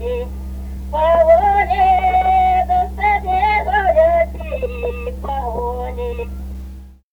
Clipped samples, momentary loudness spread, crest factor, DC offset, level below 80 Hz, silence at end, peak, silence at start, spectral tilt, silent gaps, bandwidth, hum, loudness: under 0.1%; 16 LU; 14 dB; under 0.1%; -28 dBFS; 0.2 s; -2 dBFS; 0 s; -7 dB/octave; none; over 20 kHz; none; -16 LUFS